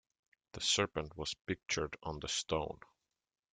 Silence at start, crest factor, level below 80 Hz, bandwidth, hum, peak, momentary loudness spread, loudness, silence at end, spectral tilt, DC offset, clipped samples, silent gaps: 0.55 s; 22 dB; -60 dBFS; 10.5 kHz; none; -18 dBFS; 12 LU; -37 LUFS; 0.8 s; -2.5 dB/octave; under 0.1%; under 0.1%; 1.41-1.45 s